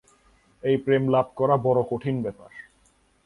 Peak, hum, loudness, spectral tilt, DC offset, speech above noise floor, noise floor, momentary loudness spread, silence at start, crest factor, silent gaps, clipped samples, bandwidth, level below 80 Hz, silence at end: -6 dBFS; none; -24 LUFS; -9 dB/octave; under 0.1%; 40 dB; -63 dBFS; 20 LU; 0.65 s; 18 dB; none; under 0.1%; 10.5 kHz; -60 dBFS; 0.65 s